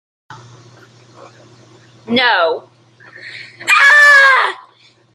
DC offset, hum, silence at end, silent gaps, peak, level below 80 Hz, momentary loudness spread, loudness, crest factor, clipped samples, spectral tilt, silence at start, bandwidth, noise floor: under 0.1%; none; 0.6 s; none; 0 dBFS; -66 dBFS; 26 LU; -9 LUFS; 14 dB; under 0.1%; -1.5 dB/octave; 0.3 s; 15.5 kHz; -49 dBFS